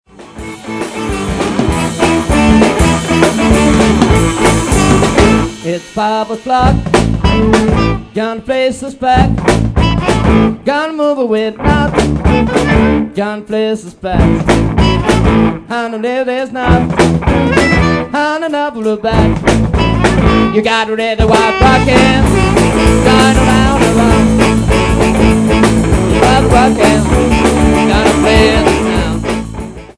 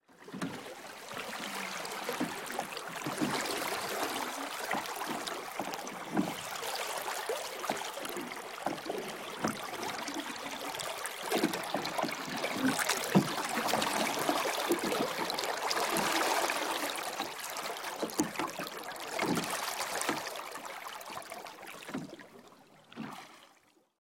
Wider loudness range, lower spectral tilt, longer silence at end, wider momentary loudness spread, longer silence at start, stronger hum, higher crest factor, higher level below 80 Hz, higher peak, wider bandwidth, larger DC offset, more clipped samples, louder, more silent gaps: second, 3 LU vs 7 LU; first, -5.5 dB/octave vs -3 dB/octave; second, 0.05 s vs 0.55 s; second, 9 LU vs 12 LU; about the same, 0.2 s vs 0.1 s; neither; second, 10 dB vs 24 dB; first, -20 dBFS vs -72 dBFS; first, 0 dBFS vs -12 dBFS; second, 11 kHz vs 17 kHz; neither; first, 0.8% vs under 0.1%; first, -11 LUFS vs -35 LUFS; neither